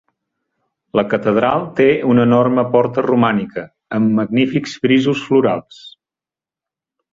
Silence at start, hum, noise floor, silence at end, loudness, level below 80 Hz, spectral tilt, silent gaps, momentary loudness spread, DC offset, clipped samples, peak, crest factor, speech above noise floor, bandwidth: 0.95 s; none; -89 dBFS; 1.25 s; -15 LUFS; -56 dBFS; -7.5 dB/octave; none; 8 LU; under 0.1%; under 0.1%; -2 dBFS; 14 dB; 74 dB; 7.6 kHz